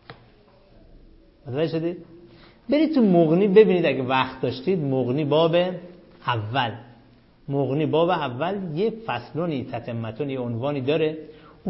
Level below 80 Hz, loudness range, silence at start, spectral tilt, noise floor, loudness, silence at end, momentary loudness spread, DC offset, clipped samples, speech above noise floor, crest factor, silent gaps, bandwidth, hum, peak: -58 dBFS; 6 LU; 0.1 s; -11 dB/octave; -54 dBFS; -23 LUFS; 0 s; 13 LU; under 0.1%; under 0.1%; 32 dB; 20 dB; none; 5.8 kHz; none; -4 dBFS